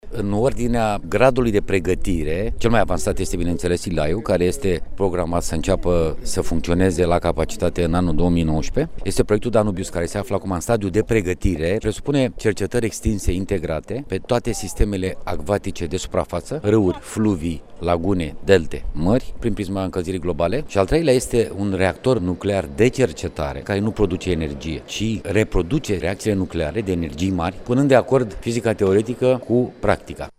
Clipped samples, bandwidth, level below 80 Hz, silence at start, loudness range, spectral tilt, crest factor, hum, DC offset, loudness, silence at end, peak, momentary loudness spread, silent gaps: under 0.1%; 15 kHz; -30 dBFS; 0.05 s; 3 LU; -6 dB/octave; 18 dB; none; under 0.1%; -21 LUFS; 0.1 s; 0 dBFS; 7 LU; none